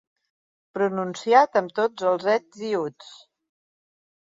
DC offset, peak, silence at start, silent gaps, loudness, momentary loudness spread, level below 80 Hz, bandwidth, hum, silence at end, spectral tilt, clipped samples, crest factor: under 0.1%; -4 dBFS; 0.75 s; none; -23 LUFS; 10 LU; -78 dBFS; 7.8 kHz; none; 1.1 s; -5 dB/octave; under 0.1%; 22 dB